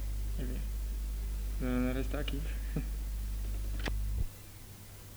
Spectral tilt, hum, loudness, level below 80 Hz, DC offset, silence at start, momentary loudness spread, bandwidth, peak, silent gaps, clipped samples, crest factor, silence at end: -6 dB/octave; none; -38 LUFS; -36 dBFS; under 0.1%; 0 s; 11 LU; over 20 kHz; -18 dBFS; none; under 0.1%; 18 dB; 0 s